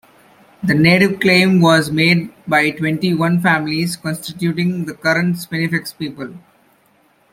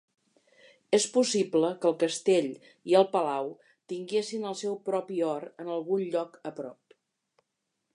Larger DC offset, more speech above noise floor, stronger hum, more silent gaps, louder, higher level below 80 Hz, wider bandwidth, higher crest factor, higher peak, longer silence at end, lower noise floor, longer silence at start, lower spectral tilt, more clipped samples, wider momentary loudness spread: neither; second, 40 dB vs 54 dB; neither; neither; first, -15 LUFS vs -29 LUFS; first, -54 dBFS vs -84 dBFS; first, 16 kHz vs 11.5 kHz; second, 16 dB vs 22 dB; first, 0 dBFS vs -8 dBFS; second, 0.95 s vs 1.2 s; second, -56 dBFS vs -82 dBFS; second, 0.6 s vs 0.9 s; first, -5.5 dB/octave vs -4 dB/octave; neither; second, 12 LU vs 15 LU